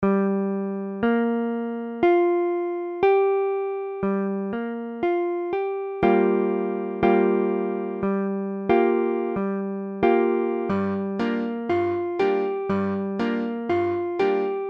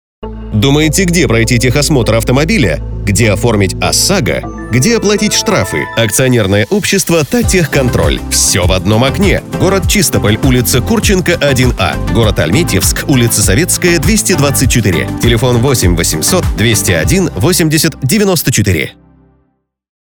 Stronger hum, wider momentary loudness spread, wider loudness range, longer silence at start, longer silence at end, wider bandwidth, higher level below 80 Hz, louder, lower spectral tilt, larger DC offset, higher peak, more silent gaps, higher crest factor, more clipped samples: neither; first, 8 LU vs 4 LU; about the same, 2 LU vs 1 LU; second, 0 s vs 0.2 s; second, 0 s vs 1.15 s; second, 5.8 kHz vs over 20 kHz; second, -58 dBFS vs -22 dBFS; second, -24 LUFS vs -10 LUFS; first, -9 dB/octave vs -4.5 dB/octave; neither; second, -6 dBFS vs 0 dBFS; neither; first, 16 dB vs 10 dB; neither